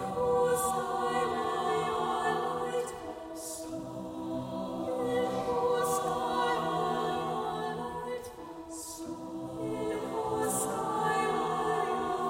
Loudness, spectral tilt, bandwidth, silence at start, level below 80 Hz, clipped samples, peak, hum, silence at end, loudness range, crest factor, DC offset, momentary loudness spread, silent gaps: -32 LUFS; -4 dB/octave; 16.5 kHz; 0 s; -60 dBFS; under 0.1%; -18 dBFS; none; 0 s; 4 LU; 16 dB; under 0.1%; 11 LU; none